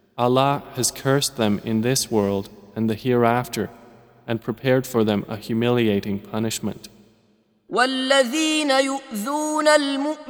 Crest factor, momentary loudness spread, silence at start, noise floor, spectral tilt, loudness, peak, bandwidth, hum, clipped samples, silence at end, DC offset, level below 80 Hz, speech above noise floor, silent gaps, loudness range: 20 dB; 10 LU; 0.15 s; -62 dBFS; -4.5 dB/octave; -21 LUFS; -2 dBFS; over 20 kHz; none; under 0.1%; 0 s; under 0.1%; -58 dBFS; 40 dB; none; 3 LU